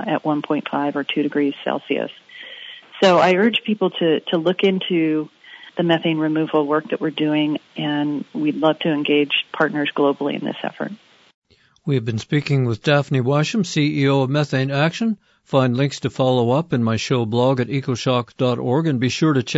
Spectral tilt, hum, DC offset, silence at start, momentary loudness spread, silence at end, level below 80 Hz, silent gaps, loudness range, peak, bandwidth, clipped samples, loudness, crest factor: -6 dB/octave; none; under 0.1%; 0 s; 8 LU; 0 s; -62 dBFS; 11.34-11.42 s; 3 LU; -2 dBFS; 8 kHz; under 0.1%; -20 LUFS; 16 dB